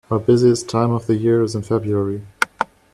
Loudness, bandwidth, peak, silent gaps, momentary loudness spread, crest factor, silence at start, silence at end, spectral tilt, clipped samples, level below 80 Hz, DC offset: -19 LUFS; 13 kHz; 0 dBFS; none; 8 LU; 18 dB; 0.1 s; 0.3 s; -6.5 dB/octave; under 0.1%; -52 dBFS; under 0.1%